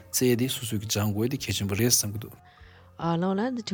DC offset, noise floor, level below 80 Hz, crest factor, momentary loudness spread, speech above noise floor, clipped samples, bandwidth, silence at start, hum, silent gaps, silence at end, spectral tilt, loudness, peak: under 0.1%; -52 dBFS; -60 dBFS; 20 dB; 11 LU; 25 dB; under 0.1%; 19 kHz; 0 s; none; none; 0 s; -4 dB/octave; -26 LUFS; -8 dBFS